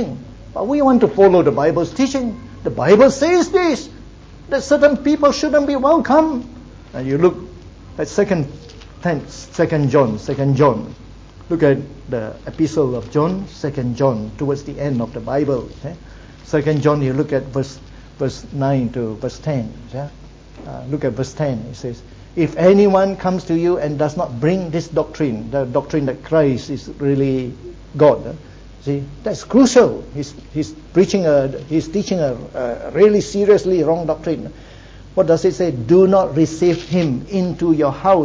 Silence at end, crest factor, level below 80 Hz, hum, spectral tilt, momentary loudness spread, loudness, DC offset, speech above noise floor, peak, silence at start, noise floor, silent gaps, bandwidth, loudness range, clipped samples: 0 s; 16 dB; -42 dBFS; none; -7 dB/octave; 16 LU; -17 LUFS; under 0.1%; 22 dB; 0 dBFS; 0 s; -38 dBFS; none; 8 kHz; 6 LU; under 0.1%